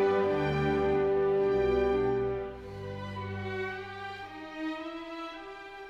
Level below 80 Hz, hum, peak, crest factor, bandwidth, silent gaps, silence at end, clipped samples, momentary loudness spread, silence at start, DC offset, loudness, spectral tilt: -50 dBFS; none; -16 dBFS; 14 dB; 7.2 kHz; none; 0 s; under 0.1%; 14 LU; 0 s; under 0.1%; -31 LUFS; -7.5 dB/octave